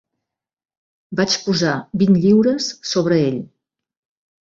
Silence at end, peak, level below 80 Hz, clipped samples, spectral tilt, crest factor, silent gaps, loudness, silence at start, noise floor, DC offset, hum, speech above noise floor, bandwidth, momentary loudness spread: 0.95 s; -4 dBFS; -56 dBFS; under 0.1%; -5.5 dB/octave; 16 dB; none; -17 LUFS; 1.1 s; -82 dBFS; under 0.1%; none; 66 dB; 7.6 kHz; 9 LU